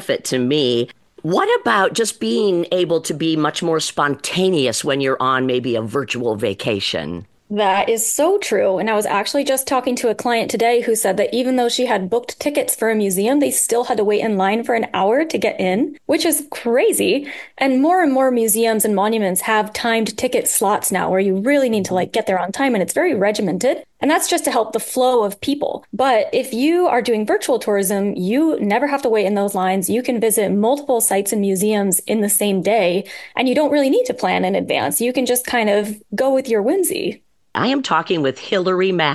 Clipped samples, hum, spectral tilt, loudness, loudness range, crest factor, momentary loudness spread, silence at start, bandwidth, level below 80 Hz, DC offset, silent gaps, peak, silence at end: under 0.1%; none; -3.5 dB/octave; -18 LUFS; 2 LU; 18 dB; 5 LU; 0 s; 13 kHz; -62 dBFS; under 0.1%; none; 0 dBFS; 0 s